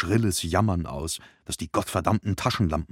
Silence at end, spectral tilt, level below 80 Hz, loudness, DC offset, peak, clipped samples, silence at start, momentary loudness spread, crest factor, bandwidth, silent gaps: 0.05 s; -5 dB/octave; -42 dBFS; -26 LUFS; under 0.1%; -6 dBFS; under 0.1%; 0 s; 9 LU; 20 dB; 16.5 kHz; none